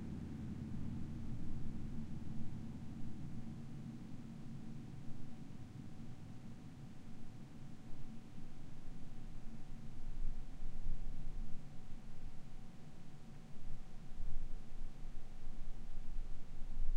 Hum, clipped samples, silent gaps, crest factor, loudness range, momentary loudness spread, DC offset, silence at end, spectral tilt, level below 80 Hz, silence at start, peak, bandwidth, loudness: none; under 0.1%; none; 16 dB; 7 LU; 9 LU; under 0.1%; 0 s; -7.5 dB/octave; -46 dBFS; 0 s; -22 dBFS; 4 kHz; -52 LUFS